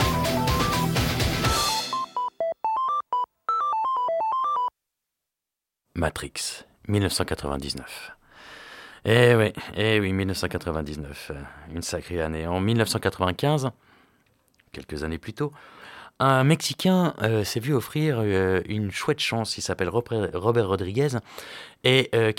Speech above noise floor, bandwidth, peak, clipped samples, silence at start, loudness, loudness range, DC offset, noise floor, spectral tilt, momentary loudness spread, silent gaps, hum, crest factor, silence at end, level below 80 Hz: 63 dB; 17 kHz; -4 dBFS; under 0.1%; 0 s; -25 LUFS; 6 LU; under 0.1%; -87 dBFS; -5 dB/octave; 17 LU; none; none; 20 dB; 0 s; -44 dBFS